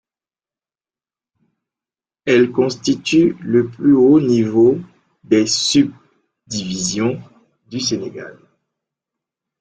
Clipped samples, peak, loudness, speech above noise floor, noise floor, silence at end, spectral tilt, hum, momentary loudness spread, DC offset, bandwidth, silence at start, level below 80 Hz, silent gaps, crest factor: under 0.1%; -2 dBFS; -16 LUFS; over 75 dB; under -90 dBFS; 1.3 s; -4.5 dB/octave; none; 14 LU; under 0.1%; 9.2 kHz; 2.25 s; -56 dBFS; none; 16 dB